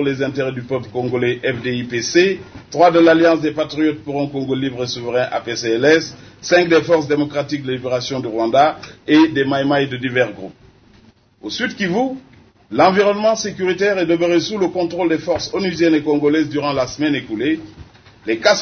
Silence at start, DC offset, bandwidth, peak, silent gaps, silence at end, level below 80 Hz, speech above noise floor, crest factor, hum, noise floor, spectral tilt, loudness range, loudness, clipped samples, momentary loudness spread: 0 s; under 0.1%; 6.6 kHz; 0 dBFS; none; 0 s; -52 dBFS; 33 dB; 18 dB; none; -50 dBFS; -5 dB/octave; 3 LU; -17 LUFS; under 0.1%; 10 LU